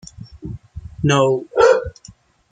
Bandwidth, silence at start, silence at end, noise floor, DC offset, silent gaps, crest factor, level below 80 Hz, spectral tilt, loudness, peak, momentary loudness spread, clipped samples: 9.4 kHz; 0.2 s; 0.6 s; -46 dBFS; under 0.1%; none; 18 dB; -42 dBFS; -5.5 dB/octave; -16 LUFS; -2 dBFS; 22 LU; under 0.1%